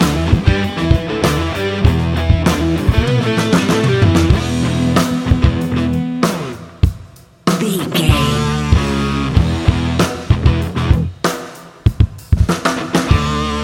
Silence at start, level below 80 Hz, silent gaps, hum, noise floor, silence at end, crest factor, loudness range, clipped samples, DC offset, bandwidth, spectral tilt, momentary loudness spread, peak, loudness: 0 s; -22 dBFS; none; none; -39 dBFS; 0 s; 14 dB; 3 LU; under 0.1%; under 0.1%; 17 kHz; -6 dB/octave; 5 LU; 0 dBFS; -15 LUFS